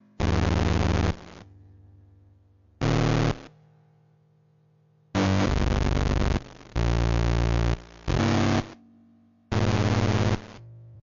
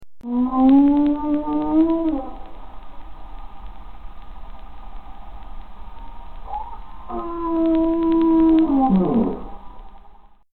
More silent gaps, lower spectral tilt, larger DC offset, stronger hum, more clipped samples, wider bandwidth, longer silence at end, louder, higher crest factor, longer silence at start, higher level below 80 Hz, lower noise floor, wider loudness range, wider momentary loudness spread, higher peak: neither; second, -6.5 dB/octave vs -11 dB/octave; second, under 0.1% vs 2%; neither; neither; first, 7.6 kHz vs 4.2 kHz; about the same, 0.05 s vs 0 s; second, -26 LUFS vs -18 LUFS; about the same, 12 dB vs 16 dB; first, 0.2 s vs 0 s; first, -32 dBFS vs -38 dBFS; first, -62 dBFS vs -47 dBFS; second, 5 LU vs 23 LU; second, 9 LU vs 26 LU; second, -14 dBFS vs -6 dBFS